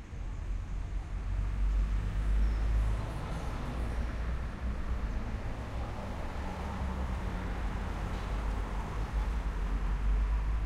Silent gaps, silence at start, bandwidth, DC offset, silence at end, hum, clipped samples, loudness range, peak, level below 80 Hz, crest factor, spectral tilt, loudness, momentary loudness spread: none; 0 s; 9.4 kHz; under 0.1%; 0 s; none; under 0.1%; 3 LU; -20 dBFS; -34 dBFS; 12 dB; -7 dB/octave; -37 LUFS; 7 LU